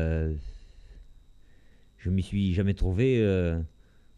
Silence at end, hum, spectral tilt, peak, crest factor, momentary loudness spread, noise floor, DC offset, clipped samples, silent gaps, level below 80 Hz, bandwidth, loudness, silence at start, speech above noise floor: 0.5 s; none; -8.5 dB/octave; -12 dBFS; 16 dB; 14 LU; -55 dBFS; under 0.1%; under 0.1%; none; -38 dBFS; 9.8 kHz; -28 LUFS; 0 s; 29 dB